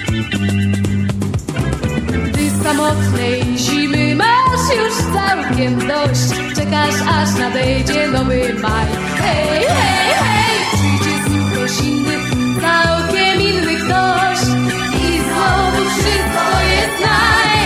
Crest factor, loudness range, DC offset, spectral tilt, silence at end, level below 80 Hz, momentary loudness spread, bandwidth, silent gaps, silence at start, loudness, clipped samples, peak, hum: 14 dB; 1 LU; under 0.1%; -4.5 dB/octave; 0 s; -30 dBFS; 5 LU; 15.5 kHz; none; 0 s; -15 LUFS; under 0.1%; 0 dBFS; none